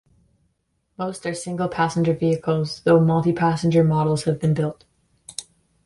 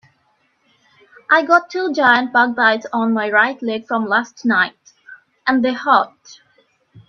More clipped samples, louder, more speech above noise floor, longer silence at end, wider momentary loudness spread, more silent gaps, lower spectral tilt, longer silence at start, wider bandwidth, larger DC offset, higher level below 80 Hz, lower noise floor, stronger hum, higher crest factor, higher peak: neither; second, -21 LUFS vs -16 LUFS; first, 51 dB vs 46 dB; first, 0.45 s vs 0.1 s; first, 13 LU vs 8 LU; neither; first, -7 dB/octave vs -4.5 dB/octave; second, 1 s vs 1.3 s; first, 11.5 kHz vs 7 kHz; neither; first, -54 dBFS vs -68 dBFS; first, -71 dBFS vs -62 dBFS; neither; about the same, 18 dB vs 18 dB; second, -4 dBFS vs 0 dBFS